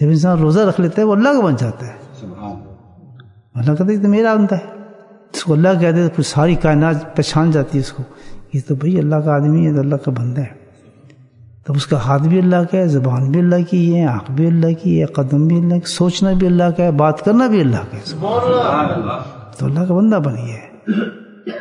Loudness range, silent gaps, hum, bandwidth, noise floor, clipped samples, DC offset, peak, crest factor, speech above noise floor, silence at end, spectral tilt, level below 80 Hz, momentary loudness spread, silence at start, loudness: 4 LU; none; none; 11 kHz; -45 dBFS; under 0.1%; under 0.1%; 0 dBFS; 16 dB; 31 dB; 0 s; -7.5 dB/octave; -42 dBFS; 15 LU; 0 s; -15 LUFS